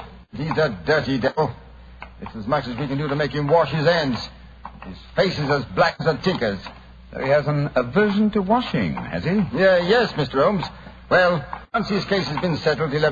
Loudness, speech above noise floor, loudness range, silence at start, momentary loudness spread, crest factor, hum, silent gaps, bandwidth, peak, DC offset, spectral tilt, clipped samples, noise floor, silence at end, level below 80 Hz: -21 LUFS; 21 dB; 3 LU; 0 s; 17 LU; 16 dB; none; none; 7.4 kHz; -4 dBFS; under 0.1%; -7 dB/octave; under 0.1%; -41 dBFS; 0 s; -44 dBFS